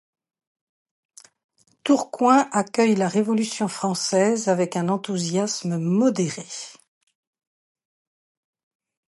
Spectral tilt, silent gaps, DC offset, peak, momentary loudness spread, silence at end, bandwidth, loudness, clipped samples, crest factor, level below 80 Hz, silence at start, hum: -5 dB/octave; none; under 0.1%; -4 dBFS; 9 LU; 2.35 s; 11.5 kHz; -22 LUFS; under 0.1%; 20 dB; -74 dBFS; 1.85 s; none